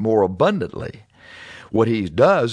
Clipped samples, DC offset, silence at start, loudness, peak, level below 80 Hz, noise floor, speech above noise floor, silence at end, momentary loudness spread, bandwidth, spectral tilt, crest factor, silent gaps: under 0.1%; under 0.1%; 0 s; -19 LUFS; -2 dBFS; -52 dBFS; -42 dBFS; 24 dB; 0 s; 22 LU; 10 kHz; -7.5 dB/octave; 18 dB; none